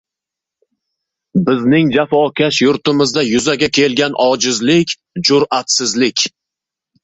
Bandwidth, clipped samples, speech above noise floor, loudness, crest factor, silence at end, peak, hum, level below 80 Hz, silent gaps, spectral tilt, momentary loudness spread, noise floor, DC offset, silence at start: 8.4 kHz; under 0.1%; 71 dB; -13 LUFS; 14 dB; 0.75 s; 0 dBFS; none; -54 dBFS; none; -4 dB/octave; 4 LU; -84 dBFS; under 0.1%; 1.35 s